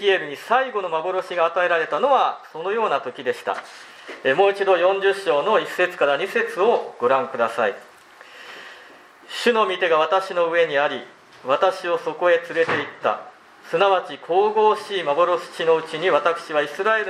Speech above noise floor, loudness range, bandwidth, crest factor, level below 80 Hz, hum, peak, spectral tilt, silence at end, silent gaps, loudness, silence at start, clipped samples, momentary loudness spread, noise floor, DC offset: 26 dB; 3 LU; 14 kHz; 18 dB; -80 dBFS; none; -4 dBFS; -4 dB/octave; 0 s; none; -21 LUFS; 0 s; under 0.1%; 11 LU; -46 dBFS; under 0.1%